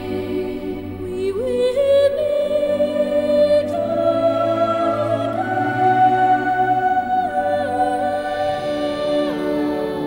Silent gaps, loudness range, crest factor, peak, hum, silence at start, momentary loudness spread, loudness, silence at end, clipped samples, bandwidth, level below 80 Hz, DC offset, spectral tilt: none; 2 LU; 12 dB; -6 dBFS; none; 0 s; 8 LU; -19 LUFS; 0 s; under 0.1%; 16.5 kHz; -48 dBFS; under 0.1%; -6.5 dB/octave